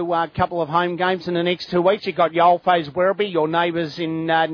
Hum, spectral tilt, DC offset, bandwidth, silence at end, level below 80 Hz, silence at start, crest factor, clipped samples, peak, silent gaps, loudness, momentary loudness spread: none; -7 dB/octave; under 0.1%; 5.4 kHz; 0 s; -56 dBFS; 0 s; 16 dB; under 0.1%; -4 dBFS; none; -20 LUFS; 6 LU